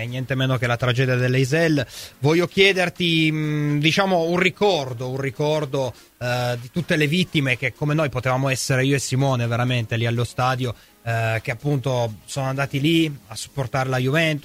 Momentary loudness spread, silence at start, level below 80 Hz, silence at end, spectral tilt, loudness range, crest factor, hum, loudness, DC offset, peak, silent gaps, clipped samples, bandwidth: 8 LU; 0 s; -52 dBFS; 0.05 s; -5.5 dB/octave; 4 LU; 18 dB; none; -21 LUFS; under 0.1%; -2 dBFS; none; under 0.1%; 16 kHz